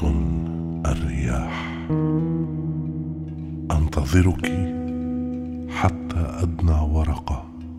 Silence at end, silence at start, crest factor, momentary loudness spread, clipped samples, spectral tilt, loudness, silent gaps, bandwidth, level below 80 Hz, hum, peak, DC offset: 0 s; 0 s; 18 dB; 9 LU; under 0.1%; -7.5 dB/octave; -24 LUFS; none; 12.5 kHz; -28 dBFS; none; -6 dBFS; under 0.1%